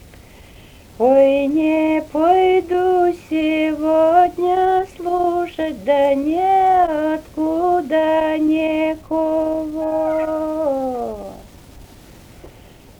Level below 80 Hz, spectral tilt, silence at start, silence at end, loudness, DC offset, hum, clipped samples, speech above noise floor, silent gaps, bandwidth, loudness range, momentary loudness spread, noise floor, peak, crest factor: -46 dBFS; -6 dB/octave; 1 s; 0.5 s; -17 LUFS; under 0.1%; none; under 0.1%; 28 dB; none; 19.5 kHz; 6 LU; 8 LU; -43 dBFS; -4 dBFS; 14 dB